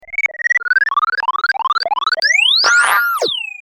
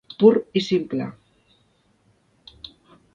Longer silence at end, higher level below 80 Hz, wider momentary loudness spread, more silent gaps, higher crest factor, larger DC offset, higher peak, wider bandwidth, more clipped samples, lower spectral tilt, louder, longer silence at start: second, 0.05 s vs 2.05 s; about the same, -62 dBFS vs -64 dBFS; second, 7 LU vs 25 LU; neither; second, 14 dB vs 22 dB; neither; about the same, 0 dBFS vs -2 dBFS; first, 18.5 kHz vs 7.4 kHz; neither; second, 2 dB/octave vs -7 dB/octave; first, -13 LUFS vs -21 LUFS; about the same, 0.1 s vs 0.2 s